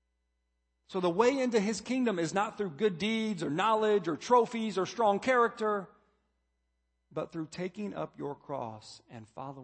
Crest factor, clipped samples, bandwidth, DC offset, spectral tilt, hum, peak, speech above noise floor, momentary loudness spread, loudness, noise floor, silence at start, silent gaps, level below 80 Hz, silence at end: 20 dB; under 0.1%; 8.8 kHz; under 0.1%; -5 dB/octave; none; -12 dBFS; 49 dB; 16 LU; -31 LUFS; -79 dBFS; 0.9 s; none; -72 dBFS; 0 s